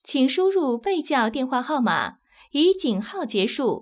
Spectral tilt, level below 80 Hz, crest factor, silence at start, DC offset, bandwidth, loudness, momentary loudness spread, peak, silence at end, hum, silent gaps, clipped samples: -9.5 dB/octave; -64 dBFS; 14 dB; 0.1 s; under 0.1%; 4 kHz; -23 LUFS; 7 LU; -10 dBFS; 0 s; none; none; under 0.1%